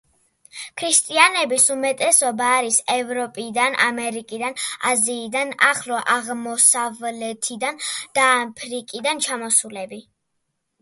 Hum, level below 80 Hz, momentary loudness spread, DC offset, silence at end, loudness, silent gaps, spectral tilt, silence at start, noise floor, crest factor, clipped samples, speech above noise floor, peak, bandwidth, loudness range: none; -72 dBFS; 13 LU; under 0.1%; 0.8 s; -19 LUFS; none; 0 dB/octave; 0.55 s; -74 dBFS; 22 dB; under 0.1%; 53 dB; 0 dBFS; 12 kHz; 4 LU